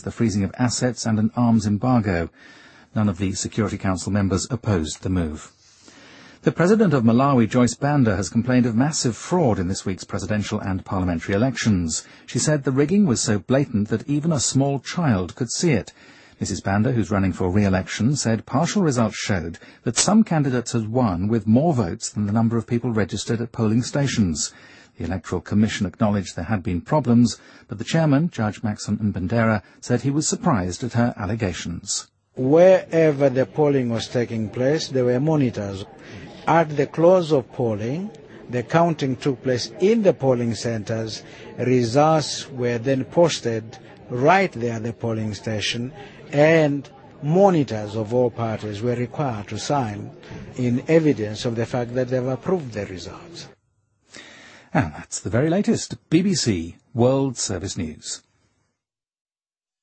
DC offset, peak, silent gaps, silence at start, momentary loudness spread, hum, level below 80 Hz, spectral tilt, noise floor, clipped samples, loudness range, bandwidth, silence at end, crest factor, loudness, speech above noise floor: under 0.1%; -2 dBFS; none; 0 s; 12 LU; none; -50 dBFS; -5.5 dB/octave; under -90 dBFS; under 0.1%; 4 LU; 8.8 kHz; 1.65 s; 20 dB; -21 LUFS; over 69 dB